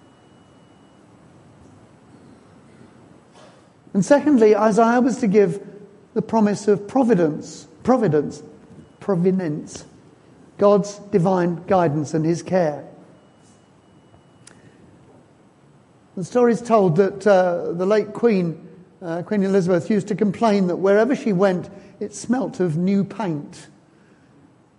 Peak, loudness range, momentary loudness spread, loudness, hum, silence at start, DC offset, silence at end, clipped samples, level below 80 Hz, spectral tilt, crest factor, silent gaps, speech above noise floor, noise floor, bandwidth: -2 dBFS; 7 LU; 16 LU; -19 LUFS; none; 3.95 s; under 0.1%; 1.15 s; under 0.1%; -62 dBFS; -7 dB/octave; 18 dB; none; 34 dB; -53 dBFS; 11 kHz